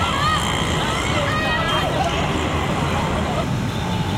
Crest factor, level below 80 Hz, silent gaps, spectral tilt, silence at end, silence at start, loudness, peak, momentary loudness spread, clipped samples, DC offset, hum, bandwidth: 14 dB; -34 dBFS; none; -4.5 dB/octave; 0 s; 0 s; -20 LUFS; -6 dBFS; 4 LU; under 0.1%; under 0.1%; none; 16.5 kHz